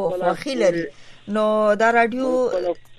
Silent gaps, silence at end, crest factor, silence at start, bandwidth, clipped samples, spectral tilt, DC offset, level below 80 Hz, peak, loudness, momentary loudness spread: none; 0.05 s; 14 dB; 0 s; 12 kHz; under 0.1%; -5 dB/octave; under 0.1%; -54 dBFS; -6 dBFS; -20 LUFS; 10 LU